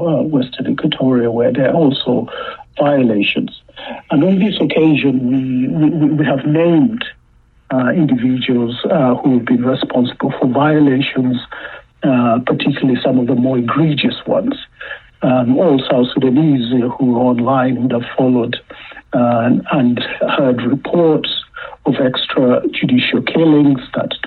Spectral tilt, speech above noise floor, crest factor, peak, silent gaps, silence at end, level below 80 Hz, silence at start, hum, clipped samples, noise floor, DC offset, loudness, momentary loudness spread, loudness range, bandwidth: -9.5 dB/octave; 36 dB; 10 dB; -4 dBFS; none; 0 s; -50 dBFS; 0 s; none; under 0.1%; -50 dBFS; under 0.1%; -14 LUFS; 9 LU; 2 LU; 4.4 kHz